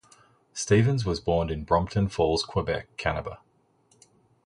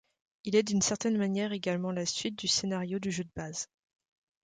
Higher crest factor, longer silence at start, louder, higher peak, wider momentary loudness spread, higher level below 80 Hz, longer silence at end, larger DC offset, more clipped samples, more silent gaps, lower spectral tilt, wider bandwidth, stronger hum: about the same, 20 dB vs 18 dB; about the same, 0.55 s vs 0.45 s; first, -26 LUFS vs -31 LUFS; first, -6 dBFS vs -14 dBFS; about the same, 12 LU vs 10 LU; first, -44 dBFS vs -66 dBFS; first, 1.1 s vs 0.8 s; neither; neither; neither; first, -5.5 dB/octave vs -4 dB/octave; first, 11.5 kHz vs 9.6 kHz; neither